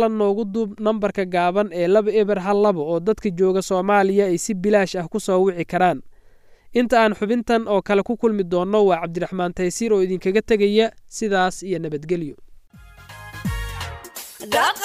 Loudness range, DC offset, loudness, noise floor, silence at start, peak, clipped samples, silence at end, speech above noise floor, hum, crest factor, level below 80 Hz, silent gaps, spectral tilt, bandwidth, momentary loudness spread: 5 LU; under 0.1%; -20 LUFS; -48 dBFS; 0 s; -4 dBFS; under 0.1%; 0 s; 29 dB; none; 16 dB; -44 dBFS; none; -5.5 dB/octave; 15.5 kHz; 11 LU